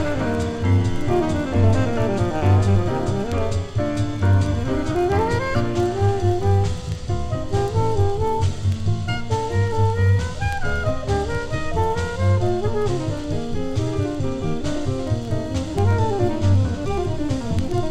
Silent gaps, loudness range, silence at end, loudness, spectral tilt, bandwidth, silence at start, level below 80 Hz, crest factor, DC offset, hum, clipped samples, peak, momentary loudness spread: none; 3 LU; 0 s; -22 LUFS; -7 dB/octave; 9.6 kHz; 0 s; -32 dBFS; 14 dB; under 0.1%; none; under 0.1%; -6 dBFS; 6 LU